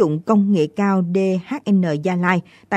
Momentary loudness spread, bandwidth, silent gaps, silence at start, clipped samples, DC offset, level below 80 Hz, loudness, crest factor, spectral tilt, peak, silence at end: 4 LU; 8.4 kHz; none; 0 s; under 0.1%; under 0.1%; -64 dBFS; -19 LUFS; 16 dB; -8 dB/octave; -2 dBFS; 0 s